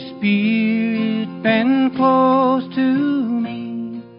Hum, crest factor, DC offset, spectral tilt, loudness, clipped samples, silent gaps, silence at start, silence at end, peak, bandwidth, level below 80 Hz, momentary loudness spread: none; 12 dB; under 0.1%; -11.5 dB/octave; -18 LUFS; under 0.1%; none; 0 s; 0 s; -6 dBFS; 5.4 kHz; -62 dBFS; 9 LU